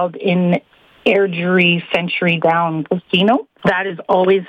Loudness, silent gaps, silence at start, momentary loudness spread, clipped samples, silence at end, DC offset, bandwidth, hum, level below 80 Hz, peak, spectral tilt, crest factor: -16 LUFS; none; 0 s; 6 LU; under 0.1%; 0.05 s; under 0.1%; 5.8 kHz; none; -58 dBFS; -2 dBFS; -7.5 dB/octave; 14 dB